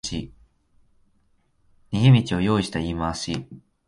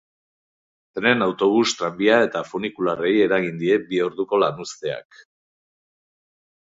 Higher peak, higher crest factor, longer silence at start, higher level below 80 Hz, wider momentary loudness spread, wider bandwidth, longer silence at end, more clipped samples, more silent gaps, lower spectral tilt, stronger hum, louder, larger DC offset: about the same, -4 dBFS vs -2 dBFS; about the same, 20 dB vs 22 dB; second, 0.05 s vs 0.95 s; first, -44 dBFS vs -64 dBFS; first, 16 LU vs 11 LU; first, 11.5 kHz vs 7.8 kHz; second, 0.3 s vs 1.65 s; neither; neither; first, -6 dB/octave vs -4.5 dB/octave; neither; about the same, -22 LUFS vs -21 LUFS; neither